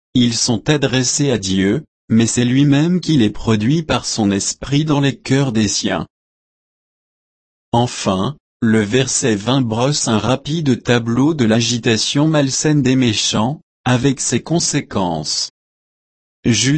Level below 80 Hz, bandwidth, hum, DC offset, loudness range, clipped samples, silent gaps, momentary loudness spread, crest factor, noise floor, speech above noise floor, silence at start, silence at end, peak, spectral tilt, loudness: -44 dBFS; 8.8 kHz; none; under 0.1%; 5 LU; under 0.1%; 1.88-2.08 s, 6.10-7.72 s, 8.40-8.60 s, 13.63-13.84 s, 15.50-16.43 s; 5 LU; 14 dB; under -90 dBFS; over 75 dB; 0.15 s; 0 s; -2 dBFS; -4.5 dB/octave; -16 LUFS